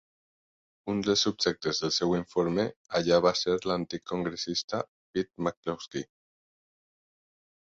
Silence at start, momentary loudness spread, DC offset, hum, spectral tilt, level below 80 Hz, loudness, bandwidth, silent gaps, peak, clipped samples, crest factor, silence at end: 0.85 s; 11 LU; under 0.1%; none; -4 dB/octave; -62 dBFS; -29 LUFS; 7.8 kHz; 2.76-2.85 s, 4.64-4.68 s, 4.88-5.14 s, 5.57-5.63 s; -10 dBFS; under 0.1%; 22 dB; 1.7 s